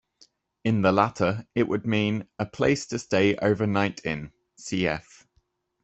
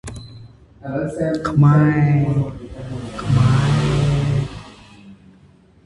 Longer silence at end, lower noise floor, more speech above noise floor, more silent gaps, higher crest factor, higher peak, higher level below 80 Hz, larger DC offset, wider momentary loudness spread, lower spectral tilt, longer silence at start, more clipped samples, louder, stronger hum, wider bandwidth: first, 0.85 s vs 0.7 s; first, -70 dBFS vs -50 dBFS; first, 45 dB vs 34 dB; neither; first, 22 dB vs 16 dB; about the same, -4 dBFS vs -2 dBFS; second, -58 dBFS vs -38 dBFS; neither; second, 11 LU vs 19 LU; second, -6 dB/octave vs -7.5 dB/octave; first, 0.65 s vs 0.05 s; neither; second, -25 LUFS vs -18 LUFS; neither; second, 8.4 kHz vs 11 kHz